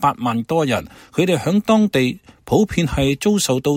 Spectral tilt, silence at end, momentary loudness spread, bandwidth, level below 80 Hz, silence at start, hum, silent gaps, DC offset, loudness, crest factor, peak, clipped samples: -5.5 dB/octave; 0 s; 7 LU; 16.5 kHz; -40 dBFS; 0 s; none; none; under 0.1%; -18 LUFS; 16 dB; -2 dBFS; under 0.1%